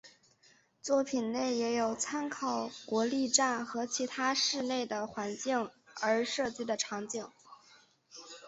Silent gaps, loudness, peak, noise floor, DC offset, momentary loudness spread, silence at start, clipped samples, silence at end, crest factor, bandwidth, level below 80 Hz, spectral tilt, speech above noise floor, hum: none; -33 LUFS; -12 dBFS; -66 dBFS; under 0.1%; 12 LU; 0.05 s; under 0.1%; 0 s; 22 dB; 8.2 kHz; -76 dBFS; -2 dB/octave; 33 dB; none